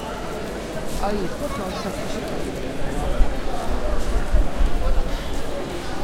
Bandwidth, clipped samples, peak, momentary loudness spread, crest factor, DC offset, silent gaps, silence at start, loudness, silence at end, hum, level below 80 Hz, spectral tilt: 14.5 kHz; under 0.1%; -2 dBFS; 5 LU; 18 dB; under 0.1%; none; 0 s; -27 LUFS; 0 s; none; -24 dBFS; -5.5 dB/octave